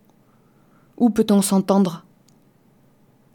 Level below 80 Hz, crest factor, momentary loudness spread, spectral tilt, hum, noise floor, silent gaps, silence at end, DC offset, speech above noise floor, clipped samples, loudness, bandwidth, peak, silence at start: -60 dBFS; 18 dB; 7 LU; -6 dB/octave; none; -57 dBFS; none; 1.35 s; under 0.1%; 39 dB; under 0.1%; -19 LUFS; 18.5 kHz; -4 dBFS; 1 s